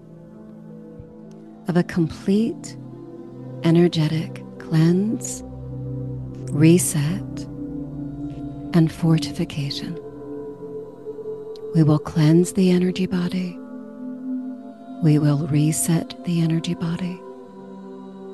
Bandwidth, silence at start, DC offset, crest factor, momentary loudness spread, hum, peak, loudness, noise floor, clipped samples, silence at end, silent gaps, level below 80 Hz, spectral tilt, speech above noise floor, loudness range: 12.5 kHz; 0 s; 0.2%; 20 dB; 21 LU; none; -4 dBFS; -22 LUFS; -42 dBFS; under 0.1%; 0 s; none; -50 dBFS; -6.5 dB/octave; 22 dB; 4 LU